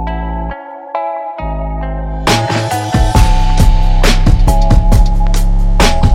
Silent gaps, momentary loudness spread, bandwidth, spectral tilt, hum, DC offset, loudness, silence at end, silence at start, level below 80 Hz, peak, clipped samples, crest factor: none; 10 LU; 14 kHz; -5.5 dB/octave; none; under 0.1%; -14 LUFS; 0 s; 0 s; -12 dBFS; 0 dBFS; 0.5%; 10 dB